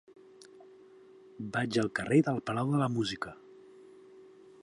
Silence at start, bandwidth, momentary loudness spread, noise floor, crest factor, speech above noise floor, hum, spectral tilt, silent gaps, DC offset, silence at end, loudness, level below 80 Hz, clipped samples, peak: 0.4 s; 11.5 kHz; 15 LU; -56 dBFS; 20 dB; 26 dB; none; -6.5 dB/octave; none; under 0.1%; 0.4 s; -31 LUFS; -68 dBFS; under 0.1%; -14 dBFS